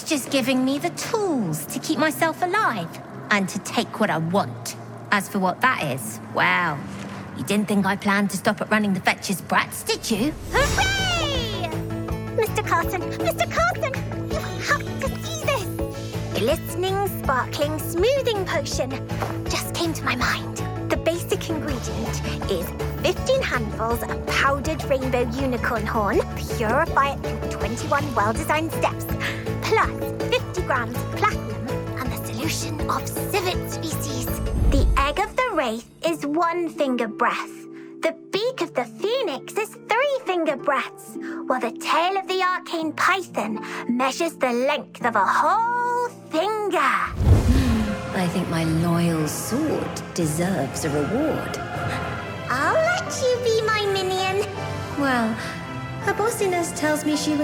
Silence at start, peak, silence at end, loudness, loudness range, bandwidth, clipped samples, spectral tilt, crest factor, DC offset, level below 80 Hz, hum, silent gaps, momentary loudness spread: 0 s; -4 dBFS; 0 s; -23 LUFS; 3 LU; 19.5 kHz; under 0.1%; -5 dB/octave; 18 dB; under 0.1%; -36 dBFS; none; none; 8 LU